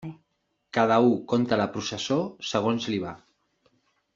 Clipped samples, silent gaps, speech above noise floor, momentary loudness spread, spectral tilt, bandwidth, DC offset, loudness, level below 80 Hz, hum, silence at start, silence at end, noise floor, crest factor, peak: under 0.1%; none; 51 dB; 10 LU; -5.5 dB/octave; 7.6 kHz; under 0.1%; -25 LUFS; -66 dBFS; none; 0 s; 1 s; -75 dBFS; 20 dB; -6 dBFS